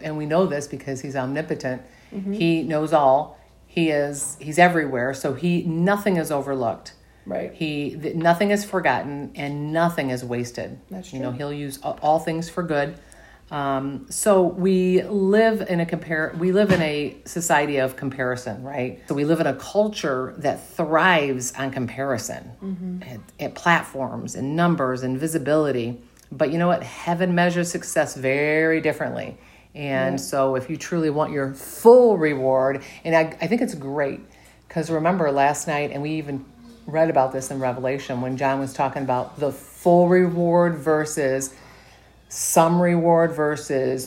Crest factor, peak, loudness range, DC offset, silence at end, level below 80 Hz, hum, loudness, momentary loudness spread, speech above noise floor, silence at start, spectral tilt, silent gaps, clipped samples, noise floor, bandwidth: 22 dB; 0 dBFS; 5 LU; under 0.1%; 0 s; -56 dBFS; none; -22 LUFS; 13 LU; 29 dB; 0 s; -5.5 dB/octave; none; under 0.1%; -50 dBFS; 16 kHz